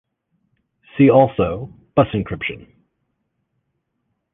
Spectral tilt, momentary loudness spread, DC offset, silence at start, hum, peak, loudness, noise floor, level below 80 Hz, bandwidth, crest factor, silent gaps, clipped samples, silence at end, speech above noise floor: -10.5 dB/octave; 19 LU; under 0.1%; 0.95 s; none; -2 dBFS; -17 LUFS; -73 dBFS; -46 dBFS; 3.8 kHz; 20 dB; none; under 0.1%; 1.75 s; 56 dB